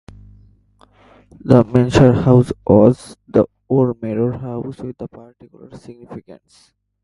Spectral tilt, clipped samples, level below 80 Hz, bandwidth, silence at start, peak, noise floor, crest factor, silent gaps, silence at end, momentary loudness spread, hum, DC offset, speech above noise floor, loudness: -8.5 dB/octave; under 0.1%; -42 dBFS; 11.5 kHz; 1.45 s; 0 dBFS; -52 dBFS; 18 dB; none; 0.7 s; 22 LU; none; under 0.1%; 36 dB; -15 LUFS